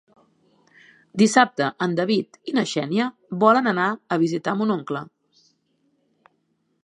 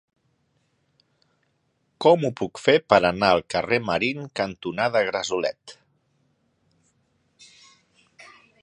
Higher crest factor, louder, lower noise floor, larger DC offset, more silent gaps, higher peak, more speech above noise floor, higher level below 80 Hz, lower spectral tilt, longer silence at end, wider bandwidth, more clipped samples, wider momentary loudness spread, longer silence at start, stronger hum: about the same, 22 dB vs 24 dB; about the same, -21 LUFS vs -22 LUFS; about the same, -70 dBFS vs -70 dBFS; neither; neither; about the same, -2 dBFS vs 0 dBFS; about the same, 49 dB vs 48 dB; second, -74 dBFS vs -58 dBFS; about the same, -5 dB/octave vs -5 dB/octave; first, 1.8 s vs 0.4 s; about the same, 11 kHz vs 10.5 kHz; neither; about the same, 10 LU vs 10 LU; second, 1.15 s vs 2 s; neither